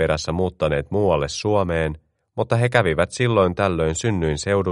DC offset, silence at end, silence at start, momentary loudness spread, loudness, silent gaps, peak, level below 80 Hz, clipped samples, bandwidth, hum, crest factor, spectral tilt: under 0.1%; 0 s; 0 s; 6 LU; -21 LUFS; none; 0 dBFS; -38 dBFS; under 0.1%; 11.5 kHz; none; 20 dB; -5.5 dB/octave